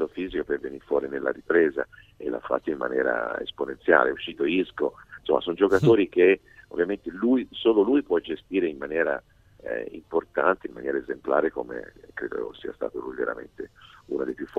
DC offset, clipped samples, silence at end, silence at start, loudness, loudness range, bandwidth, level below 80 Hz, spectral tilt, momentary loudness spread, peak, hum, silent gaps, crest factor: under 0.1%; under 0.1%; 0 s; 0 s; -26 LUFS; 6 LU; 8 kHz; -58 dBFS; -7 dB/octave; 14 LU; -2 dBFS; none; none; 24 dB